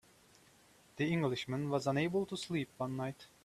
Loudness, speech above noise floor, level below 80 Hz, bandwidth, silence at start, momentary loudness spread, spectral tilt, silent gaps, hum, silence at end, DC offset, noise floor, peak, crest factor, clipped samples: -37 LUFS; 29 dB; -72 dBFS; 14 kHz; 0.95 s; 7 LU; -6 dB/octave; none; none; 0.2 s; under 0.1%; -65 dBFS; -20 dBFS; 18 dB; under 0.1%